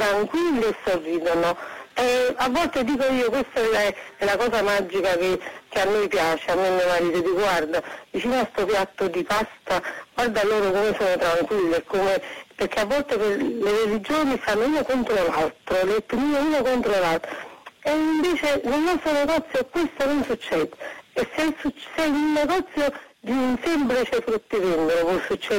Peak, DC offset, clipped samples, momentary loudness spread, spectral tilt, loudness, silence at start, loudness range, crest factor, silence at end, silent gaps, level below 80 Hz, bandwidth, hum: -14 dBFS; under 0.1%; under 0.1%; 6 LU; -4.5 dB/octave; -23 LUFS; 0 s; 2 LU; 8 dB; 0 s; none; -50 dBFS; 16.5 kHz; none